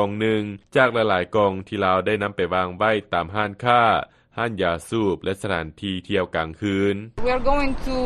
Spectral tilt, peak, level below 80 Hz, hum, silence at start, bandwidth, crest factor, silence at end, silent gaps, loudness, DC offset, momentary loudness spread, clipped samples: -6 dB/octave; -2 dBFS; -36 dBFS; none; 0 s; 12 kHz; 20 dB; 0 s; none; -22 LUFS; under 0.1%; 8 LU; under 0.1%